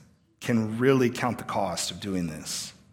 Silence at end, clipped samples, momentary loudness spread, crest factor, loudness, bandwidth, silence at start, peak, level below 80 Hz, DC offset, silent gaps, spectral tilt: 0.2 s; under 0.1%; 10 LU; 20 dB; -27 LUFS; 17 kHz; 0.4 s; -8 dBFS; -60 dBFS; under 0.1%; none; -5 dB/octave